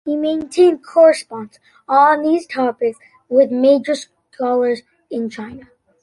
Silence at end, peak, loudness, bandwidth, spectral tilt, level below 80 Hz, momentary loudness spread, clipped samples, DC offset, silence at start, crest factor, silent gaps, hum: 0.4 s; -2 dBFS; -16 LUFS; 11.5 kHz; -4.5 dB/octave; -62 dBFS; 16 LU; under 0.1%; under 0.1%; 0.05 s; 14 dB; none; none